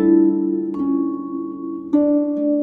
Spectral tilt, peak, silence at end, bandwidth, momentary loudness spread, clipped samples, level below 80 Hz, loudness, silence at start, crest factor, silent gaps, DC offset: -11.5 dB/octave; -4 dBFS; 0 s; 2.2 kHz; 12 LU; under 0.1%; -60 dBFS; -20 LUFS; 0 s; 14 dB; none; under 0.1%